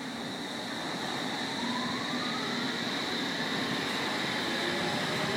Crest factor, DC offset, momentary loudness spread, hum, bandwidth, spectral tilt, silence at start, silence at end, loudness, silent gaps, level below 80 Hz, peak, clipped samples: 14 dB; under 0.1%; 5 LU; none; 16.5 kHz; -3.5 dB/octave; 0 s; 0 s; -31 LUFS; none; -68 dBFS; -18 dBFS; under 0.1%